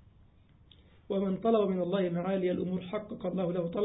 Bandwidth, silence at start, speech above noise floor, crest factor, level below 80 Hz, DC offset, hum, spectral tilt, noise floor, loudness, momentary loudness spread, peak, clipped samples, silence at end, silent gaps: 3.9 kHz; 1.1 s; 30 dB; 16 dB; -62 dBFS; under 0.1%; none; -6.5 dB/octave; -60 dBFS; -32 LUFS; 8 LU; -16 dBFS; under 0.1%; 0 s; none